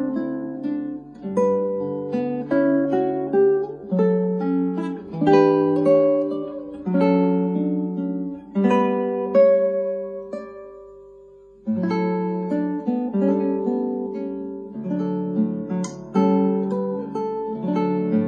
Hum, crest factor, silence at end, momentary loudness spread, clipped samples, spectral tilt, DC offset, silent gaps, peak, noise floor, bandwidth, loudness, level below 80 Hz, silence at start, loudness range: 50 Hz at -60 dBFS; 18 dB; 0 s; 12 LU; under 0.1%; -8.5 dB/octave; under 0.1%; none; -4 dBFS; -47 dBFS; 7.4 kHz; -22 LUFS; -62 dBFS; 0 s; 5 LU